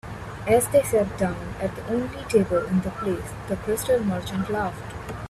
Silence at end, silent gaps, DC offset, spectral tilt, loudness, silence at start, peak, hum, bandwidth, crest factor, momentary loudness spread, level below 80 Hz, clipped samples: 0 s; none; under 0.1%; -5.5 dB/octave; -25 LUFS; 0.05 s; -8 dBFS; none; 15 kHz; 18 dB; 11 LU; -44 dBFS; under 0.1%